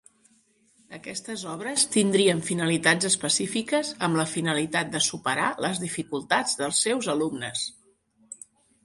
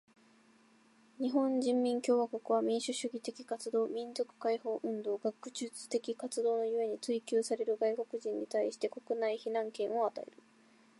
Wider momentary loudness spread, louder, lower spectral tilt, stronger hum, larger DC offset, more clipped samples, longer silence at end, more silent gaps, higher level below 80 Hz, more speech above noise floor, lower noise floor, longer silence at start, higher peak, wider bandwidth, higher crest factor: first, 13 LU vs 8 LU; first, -25 LUFS vs -35 LUFS; about the same, -3 dB/octave vs -4 dB/octave; neither; neither; neither; second, 0.5 s vs 0.75 s; neither; first, -66 dBFS vs under -90 dBFS; first, 38 dB vs 31 dB; about the same, -64 dBFS vs -66 dBFS; second, 0.9 s vs 1.2 s; first, -6 dBFS vs -18 dBFS; about the same, 12 kHz vs 11.5 kHz; about the same, 20 dB vs 16 dB